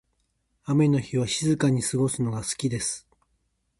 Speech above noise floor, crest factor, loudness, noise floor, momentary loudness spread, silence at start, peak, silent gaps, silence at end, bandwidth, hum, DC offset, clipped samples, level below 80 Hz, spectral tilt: 49 dB; 18 dB; -25 LUFS; -73 dBFS; 7 LU; 0.65 s; -10 dBFS; none; 0.8 s; 11.5 kHz; none; under 0.1%; under 0.1%; -56 dBFS; -5 dB/octave